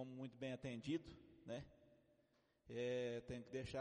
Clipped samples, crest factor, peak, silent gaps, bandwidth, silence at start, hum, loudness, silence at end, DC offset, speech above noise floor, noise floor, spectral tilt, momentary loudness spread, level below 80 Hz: under 0.1%; 16 dB; -34 dBFS; none; 10 kHz; 0 s; none; -49 LUFS; 0 s; under 0.1%; 32 dB; -80 dBFS; -6 dB/octave; 12 LU; -72 dBFS